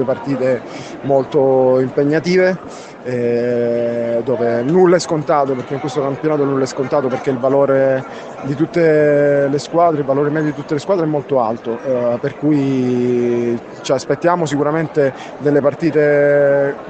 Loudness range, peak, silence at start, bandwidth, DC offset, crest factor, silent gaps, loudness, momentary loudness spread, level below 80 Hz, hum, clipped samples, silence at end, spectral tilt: 2 LU; 0 dBFS; 0 s; 8.8 kHz; under 0.1%; 14 dB; none; -16 LUFS; 9 LU; -56 dBFS; none; under 0.1%; 0 s; -7 dB/octave